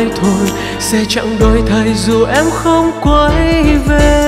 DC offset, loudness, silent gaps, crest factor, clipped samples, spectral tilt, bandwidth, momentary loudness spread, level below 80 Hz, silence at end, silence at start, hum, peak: under 0.1%; -11 LUFS; none; 10 dB; under 0.1%; -5 dB/octave; 15.5 kHz; 4 LU; -18 dBFS; 0 s; 0 s; none; 0 dBFS